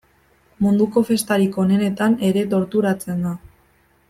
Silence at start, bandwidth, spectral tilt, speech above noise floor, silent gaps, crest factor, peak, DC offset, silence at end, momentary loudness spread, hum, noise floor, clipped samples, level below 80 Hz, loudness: 0.6 s; 15 kHz; -6.5 dB/octave; 40 dB; none; 16 dB; -4 dBFS; under 0.1%; 0.7 s; 7 LU; none; -58 dBFS; under 0.1%; -56 dBFS; -19 LUFS